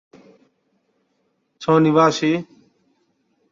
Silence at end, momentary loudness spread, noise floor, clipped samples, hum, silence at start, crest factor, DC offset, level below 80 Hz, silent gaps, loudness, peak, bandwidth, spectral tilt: 1.1 s; 14 LU; -69 dBFS; under 0.1%; none; 1.6 s; 18 dB; under 0.1%; -66 dBFS; none; -18 LUFS; -4 dBFS; 7.6 kHz; -6 dB/octave